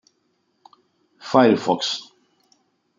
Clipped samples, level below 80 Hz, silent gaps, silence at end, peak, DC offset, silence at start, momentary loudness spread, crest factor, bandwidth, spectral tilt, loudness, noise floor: under 0.1%; -72 dBFS; none; 0.95 s; -2 dBFS; under 0.1%; 1.25 s; 14 LU; 22 dB; 7.6 kHz; -5 dB/octave; -19 LUFS; -69 dBFS